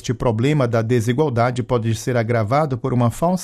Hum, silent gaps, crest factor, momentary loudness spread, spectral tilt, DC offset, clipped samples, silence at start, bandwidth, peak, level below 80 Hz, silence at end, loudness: none; none; 14 dB; 3 LU; -7 dB/octave; under 0.1%; under 0.1%; 0.05 s; 14 kHz; -6 dBFS; -44 dBFS; 0 s; -19 LUFS